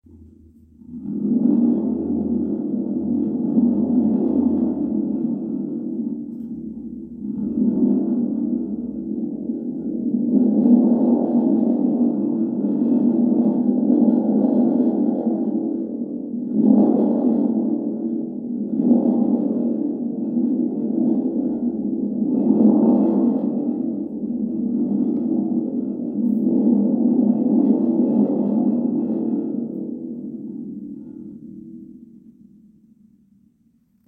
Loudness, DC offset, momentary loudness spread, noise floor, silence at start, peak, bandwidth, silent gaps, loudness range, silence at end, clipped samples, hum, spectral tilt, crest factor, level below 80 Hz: -20 LUFS; under 0.1%; 13 LU; -60 dBFS; 0.15 s; -4 dBFS; 1.5 kHz; none; 6 LU; 2.1 s; under 0.1%; none; -14 dB/octave; 16 dB; -58 dBFS